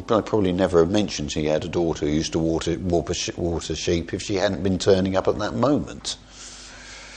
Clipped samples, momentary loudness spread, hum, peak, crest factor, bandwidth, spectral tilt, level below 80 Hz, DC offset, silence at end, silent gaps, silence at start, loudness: under 0.1%; 12 LU; none; -4 dBFS; 18 dB; 10 kHz; -5 dB/octave; -42 dBFS; under 0.1%; 0 s; none; 0 s; -23 LUFS